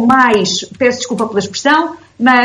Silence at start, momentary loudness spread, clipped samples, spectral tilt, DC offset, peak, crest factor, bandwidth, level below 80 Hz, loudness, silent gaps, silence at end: 0 s; 7 LU; under 0.1%; -3.5 dB/octave; under 0.1%; 0 dBFS; 12 dB; 11.5 kHz; -52 dBFS; -13 LUFS; none; 0 s